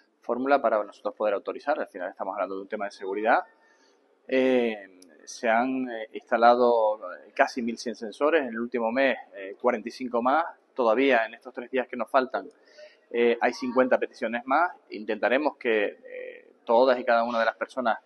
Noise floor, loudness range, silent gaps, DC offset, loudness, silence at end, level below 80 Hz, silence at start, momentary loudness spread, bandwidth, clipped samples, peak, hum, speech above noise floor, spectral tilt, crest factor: -63 dBFS; 4 LU; none; under 0.1%; -26 LUFS; 0.05 s; -82 dBFS; 0.3 s; 13 LU; 11.5 kHz; under 0.1%; -4 dBFS; none; 37 dB; -4 dB/octave; 22 dB